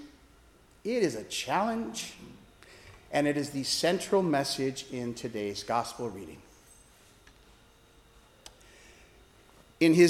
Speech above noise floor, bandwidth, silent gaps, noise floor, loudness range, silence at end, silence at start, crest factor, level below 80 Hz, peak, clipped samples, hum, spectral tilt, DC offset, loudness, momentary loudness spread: 31 dB; 15.5 kHz; none; -59 dBFS; 9 LU; 0 s; 0 s; 22 dB; -62 dBFS; -8 dBFS; under 0.1%; none; -4.5 dB/octave; under 0.1%; -31 LUFS; 25 LU